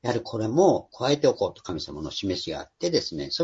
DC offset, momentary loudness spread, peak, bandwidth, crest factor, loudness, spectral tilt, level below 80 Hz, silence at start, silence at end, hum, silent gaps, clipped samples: under 0.1%; 12 LU; -6 dBFS; 8 kHz; 18 dB; -26 LUFS; -5 dB/octave; -54 dBFS; 0.05 s; 0 s; none; none; under 0.1%